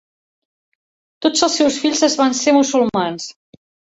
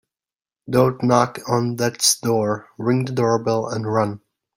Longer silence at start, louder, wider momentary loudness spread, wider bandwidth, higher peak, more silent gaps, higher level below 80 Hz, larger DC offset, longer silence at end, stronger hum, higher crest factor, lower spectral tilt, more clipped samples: first, 1.2 s vs 0.65 s; first, -16 LUFS vs -20 LUFS; about the same, 9 LU vs 7 LU; second, 8.2 kHz vs 16.5 kHz; about the same, -2 dBFS vs -2 dBFS; neither; about the same, -60 dBFS vs -58 dBFS; neither; first, 0.7 s vs 0.4 s; neither; about the same, 18 dB vs 18 dB; second, -2.5 dB/octave vs -4.5 dB/octave; neither